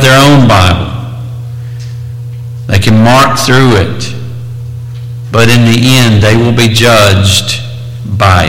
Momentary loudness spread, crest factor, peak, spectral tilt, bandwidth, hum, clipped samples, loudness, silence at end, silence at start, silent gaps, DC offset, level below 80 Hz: 17 LU; 8 dB; 0 dBFS; -5 dB/octave; 17 kHz; none; 0.7%; -6 LUFS; 0 s; 0 s; none; under 0.1%; -30 dBFS